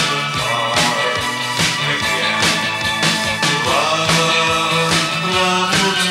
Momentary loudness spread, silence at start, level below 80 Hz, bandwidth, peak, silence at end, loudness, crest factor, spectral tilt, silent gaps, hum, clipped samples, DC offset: 4 LU; 0 s; -46 dBFS; 16 kHz; -2 dBFS; 0 s; -15 LUFS; 14 dB; -2.5 dB/octave; none; none; under 0.1%; under 0.1%